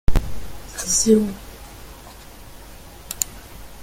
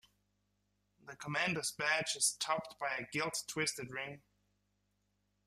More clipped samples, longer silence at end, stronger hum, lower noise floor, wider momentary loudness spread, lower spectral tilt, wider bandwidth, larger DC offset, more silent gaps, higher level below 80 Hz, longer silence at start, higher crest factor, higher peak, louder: neither; second, 0 s vs 1.3 s; second, none vs 50 Hz at -65 dBFS; second, -41 dBFS vs -80 dBFS; first, 25 LU vs 13 LU; first, -4 dB/octave vs -2 dB/octave; first, 17 kHz vs 15 kHz; neither; neither; first, -30 dBFS vs -76 dBFS; second, 0.1 s vs 1.05 s; about the same, 22 dB vs 24 dB; first, 0 dBFS vs -16 dBFS; first, -21 LUFS vs -36 LUFS